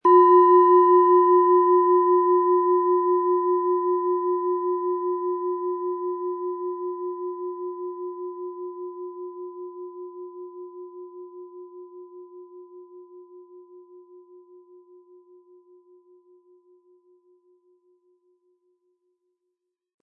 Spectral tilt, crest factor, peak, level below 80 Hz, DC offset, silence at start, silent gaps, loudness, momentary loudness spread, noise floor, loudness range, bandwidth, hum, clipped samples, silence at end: -8.5 dB/octave; 18 dB; -6 dBFS; -88 dBFS; under 0.1%; 0.05 s; none; -21 LUFS; 25 LU; -81 dBFS; 25 LU; 3 kHz; none; under 0.1%; 6.25 s